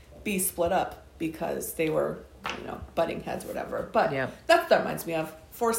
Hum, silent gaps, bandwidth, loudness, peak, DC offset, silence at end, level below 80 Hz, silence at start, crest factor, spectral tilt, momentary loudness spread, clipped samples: none; none; 16.5 kHz; -29 LUFS; -8 dBFS; under 0.1%; 0 s; -54 dBFS; 0.1 s; 20 dB; -4 dB/octave; 12 LU; under 0.1%